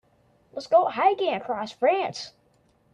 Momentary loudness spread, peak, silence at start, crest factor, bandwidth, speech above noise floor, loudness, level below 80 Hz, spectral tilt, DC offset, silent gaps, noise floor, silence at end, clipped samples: 17 LU; -8 dBFS; 0.55 s; 18 dB; 9.4 kHz; 40 dB; -24 LUFS; -72 dBFS; -4 dB/octave; under 0.1%; none; -64 dBFS; 0.65 s; under 0.1%